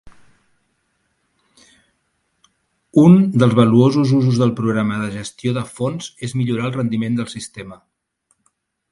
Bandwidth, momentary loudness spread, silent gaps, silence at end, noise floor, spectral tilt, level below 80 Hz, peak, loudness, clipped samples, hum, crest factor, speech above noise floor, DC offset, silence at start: 11.5 kHz; 16 LU; none; 1.15 s; -68 dBFS; -7.5 dB/octave; -54 dBFS; 0 dBFS; -17 LUFS; under 0.1%; none; 18 dB; 52 dB; under 0.1%; 0.05 s